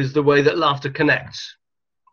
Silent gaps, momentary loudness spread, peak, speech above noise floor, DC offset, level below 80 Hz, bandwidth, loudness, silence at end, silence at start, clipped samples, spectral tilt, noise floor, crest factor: none; 17 LU; -2 dBFS; 46 dB; under 0.1%; -56 dBFS; 7 kHz; -18 LUFS; 0.6 s; 0 s; under 0.1%; -6 dB/octave; -65 dBFS; 18 dB